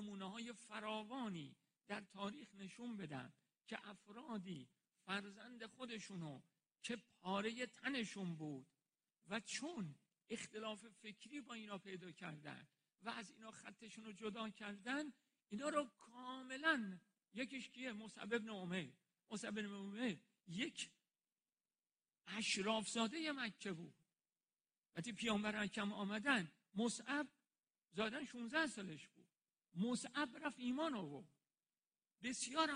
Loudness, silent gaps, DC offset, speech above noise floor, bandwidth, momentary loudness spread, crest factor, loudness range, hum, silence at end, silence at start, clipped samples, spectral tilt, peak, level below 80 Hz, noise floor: -47 LUFS; none; under 0.1%; over 43 dB; 10 kHz; 15 LU; 26 dB; 9 LU; none; 0 s; 0 s; under 0.1%; -3.5 dB/octave; -22 dBFS; -86 dBFS; under -90 dBFS